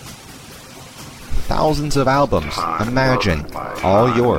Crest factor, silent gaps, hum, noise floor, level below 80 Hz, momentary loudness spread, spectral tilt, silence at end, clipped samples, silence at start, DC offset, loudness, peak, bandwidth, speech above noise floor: 16 dB; none; none; -38 dBFS; -30 dBFS; 21 LU; -6 dB/octave; 0 s; under 0.1%; 0 s; 0.6%; -18 LUFS; -2 dBFS; 16.5 kHz; 21 dB